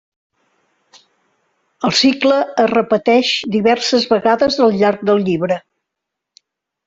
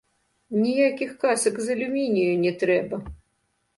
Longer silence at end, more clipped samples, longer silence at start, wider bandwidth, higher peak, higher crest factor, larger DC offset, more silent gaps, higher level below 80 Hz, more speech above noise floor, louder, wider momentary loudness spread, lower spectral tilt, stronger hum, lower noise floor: first, 1.25 s vs 0.6 s; neither; first, 1.8 s vs 0.5 s; second, 7.8 kHz vs 11.5 kHz; first, -2 dBFS vs -10 dBFS; about the same, 14 dB vs 16 dB; neither; neither; about the same, -56 dBFS vs -54 dBFS; first, 66 dB vs 49 dB; first, -14 LUFS vs -24 LUFS; second, 5 LU vs 8 LU; about the same, -4.5 dB/octave vs -5 dB/octave; neither; first, -80 dBFS vs -72 dBFS